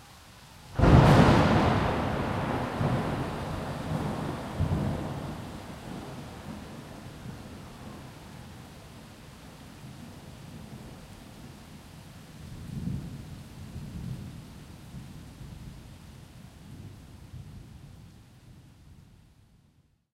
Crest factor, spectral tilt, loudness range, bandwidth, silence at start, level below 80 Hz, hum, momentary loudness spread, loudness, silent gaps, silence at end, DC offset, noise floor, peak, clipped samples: 26 dB; -7 dB/octave; 23 LU; 15.5 kHz; 0 s; -42 dBFS; none; 24 LU; -27 LUFS; none; 1.1 s; under 0.1%; -65 dBFS; -4 dBFS; under 0.1%